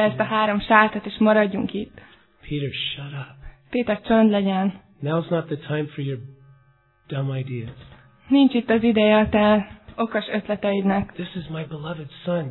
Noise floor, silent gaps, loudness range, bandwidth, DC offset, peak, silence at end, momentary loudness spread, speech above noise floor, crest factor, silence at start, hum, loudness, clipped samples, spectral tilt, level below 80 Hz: -59 dBFS; none; 7 LU; 4.2 kHz; under 0.1%; 0 dBFS; 0 s; 15 LU; 38 dB; 22 dB; 0 s; none; -22 LUFS; under 0.1%; -10 dB/octave; -50 dBFS